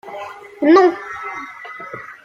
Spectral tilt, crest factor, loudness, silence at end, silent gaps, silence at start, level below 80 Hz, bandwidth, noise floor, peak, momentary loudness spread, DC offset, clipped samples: -5 dB/octave; 18 dB; -15 LUFS; 0.25 s; none; 0.05 s; -64 dBFS; 7.2 kHz; -34 dBFS; -2 dBFS; 20 LU; under 0.1%; under 0.1%